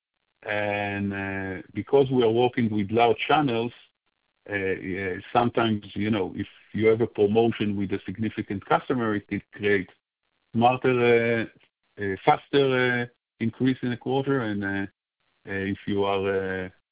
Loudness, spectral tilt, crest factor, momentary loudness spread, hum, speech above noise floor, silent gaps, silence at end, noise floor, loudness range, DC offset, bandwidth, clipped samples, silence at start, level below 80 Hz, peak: -25 LUFS; -10.5 dB/octave; 22 dB; 11 LU; none; 52 dB; none; 0.2 s; -76 dBFS; 4 LU; under 0.1%; 4 kHz; under 0.1%; 0.45 s; -56 dBFS; -4 dBFS